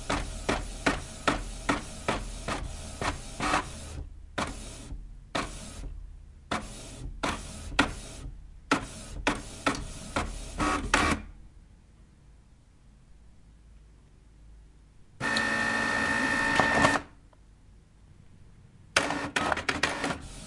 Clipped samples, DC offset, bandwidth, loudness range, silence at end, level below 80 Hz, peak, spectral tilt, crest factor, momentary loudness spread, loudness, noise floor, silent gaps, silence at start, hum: under 0.1%; under 0.1%; 11.5 kHz; 9 LU; 0 s; -44 dBFS; -4 dBFS; -3.5 dB/octave; 28 dB; 17 LU; -30 LUFS; -56 dBFS; none; 0 s; none